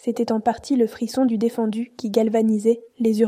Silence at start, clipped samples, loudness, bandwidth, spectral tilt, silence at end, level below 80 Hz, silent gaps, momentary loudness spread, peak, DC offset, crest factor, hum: 0.05 s; under 0.1%; -22 LUFS; 15 kHz; -6.5 dB/octave; 0 s; -62 dBFS; none; 5 LU; -6 dBFS; under 0.1%; 16 dB; none